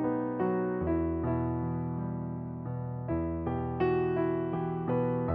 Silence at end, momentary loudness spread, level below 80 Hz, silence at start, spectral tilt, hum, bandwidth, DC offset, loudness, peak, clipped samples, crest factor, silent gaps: 0 s; 8 LU; -48 dBFS; 0 s; -9 dB/octave; none; 4.9 kHz; under 0.1%; -32 LUFS; -18 dBFS; under 0.1%; 14 dB; none